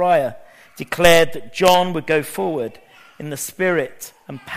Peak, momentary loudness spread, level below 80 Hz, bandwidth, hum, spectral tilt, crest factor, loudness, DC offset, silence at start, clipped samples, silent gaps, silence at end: 0 dBFS; 21 LU; -46 dBFS; 15.5 kHz; none; -4 dB/octave; 20 dB; -18 LUFS; under 0.1%; 0 s; under 0.1%; none; 0 s